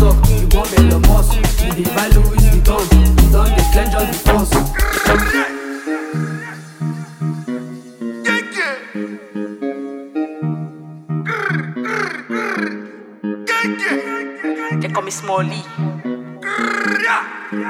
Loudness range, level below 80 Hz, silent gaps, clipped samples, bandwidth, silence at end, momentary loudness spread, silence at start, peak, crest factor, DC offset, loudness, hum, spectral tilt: 9 LU; -18 dBFS; none; under 0.1%; 17 kHz; 0 s; 14 LU; 0 s; 0 dBFS; 16 dB; under 0.1%; -17 LUFS; none; -5.5 dB/octave